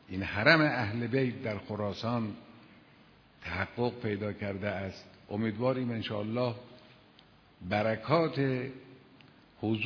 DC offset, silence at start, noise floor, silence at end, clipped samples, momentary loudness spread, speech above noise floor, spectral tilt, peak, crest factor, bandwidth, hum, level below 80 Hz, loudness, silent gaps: under 0.1%; 0.1 s; -60 dBFS; 0 s; under 0.1%; 14 LU; 29 dB; -4.5 dB/octave; -8 dBFS; 24 dB; 5.4 kHz; none; -64 dBFS; -32 LUFS; none